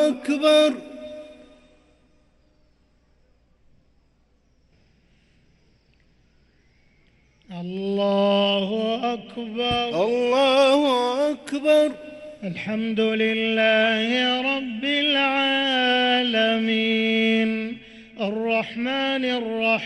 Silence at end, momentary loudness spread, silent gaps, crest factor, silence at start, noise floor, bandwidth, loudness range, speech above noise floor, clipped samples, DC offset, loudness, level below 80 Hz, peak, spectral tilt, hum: 0 s; 15 LU; none; 16 dB; 0 s; -62 dBFS; 12 kHz; 6 LU; 41 dB; under 0.1%; under 0.1%; -21 LUFS; -60 dBFS; -6 dBFS; -4.5 dB/octave; none